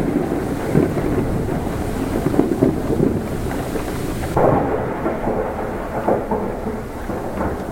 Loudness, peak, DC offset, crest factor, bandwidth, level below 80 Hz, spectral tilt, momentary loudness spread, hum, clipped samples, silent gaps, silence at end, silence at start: -21 LUFS; 0 dBFS; under 0.1%; 20 dB; 16.5 kHz; -32 dBFS; -7.5 dB/octave; 7 LU; none; under 0.1%; none; 0 s; 0 s